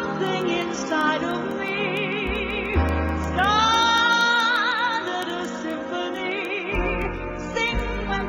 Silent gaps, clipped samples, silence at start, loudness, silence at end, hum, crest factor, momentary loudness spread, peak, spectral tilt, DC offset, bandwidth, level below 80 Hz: none; under 0.1%; 0 s; -23 LUFS; 0 s; none; 16 dB; 11 LU; -8 dBFS; -4 dB/octave; under 0.1%; 16.5 kHz; -34 dBFS